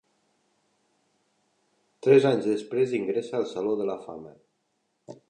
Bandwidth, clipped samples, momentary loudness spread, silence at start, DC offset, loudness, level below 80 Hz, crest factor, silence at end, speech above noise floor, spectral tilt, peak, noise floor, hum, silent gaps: 9.4 kHz; under 0.1%; 16 LU; 2.05 s; under 0.1%; -25 LUFS; -76 dBFS; 20 dB; 0.15 s; 51 dB; -7 dB/octave; -8 dBFS; -75 dBFS; none; none